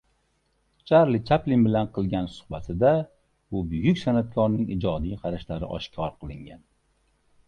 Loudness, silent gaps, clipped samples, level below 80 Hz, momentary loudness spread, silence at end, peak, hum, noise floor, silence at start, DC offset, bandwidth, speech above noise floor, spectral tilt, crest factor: -25 LUFS; none; under 0.1%; -46 dBFS; 13 LU; 0.9 s; -6 dBFS; none; -70 dBFS; 0.85 s; under 0.1%; 9 kHz; 45 dB; -8.5 dB/octave; 20 dB